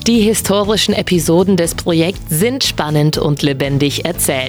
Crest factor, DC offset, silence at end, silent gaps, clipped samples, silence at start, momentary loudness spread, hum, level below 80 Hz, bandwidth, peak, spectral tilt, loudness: 12 dB; under 0.1%; 0 s; none; under 0.1%; 0 s; 3 LU; none; -34 dBFS; over 20 kHz; -2 dBFS; -4.5 dB/octave; -14 LUFS